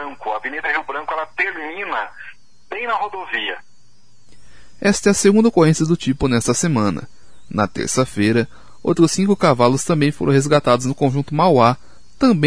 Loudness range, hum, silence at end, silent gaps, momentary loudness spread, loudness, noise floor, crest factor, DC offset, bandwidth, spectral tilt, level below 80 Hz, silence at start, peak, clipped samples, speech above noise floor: 8 LU; none; 0 s; none; 13 LU; -18 LUFS; -56 dBFS; 18 dB; 1%; 11 kHz; -5 dB/octave; -46 dBFS; 0 s; 0 dBFS; under 0.1%; 39 dB